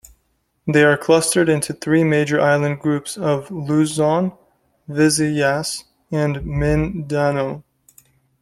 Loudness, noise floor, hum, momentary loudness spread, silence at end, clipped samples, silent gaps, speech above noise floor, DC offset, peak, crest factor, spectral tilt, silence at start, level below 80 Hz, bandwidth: -18 LUFS; -67 dBFS; none; 11 LU; 0.8 s; under 0.1%; none; 49 dB; under 0.1%; -2 dBFS; 18 dB; -5 dB/octave; 0.65 s; -40 dBFS; 15 kHz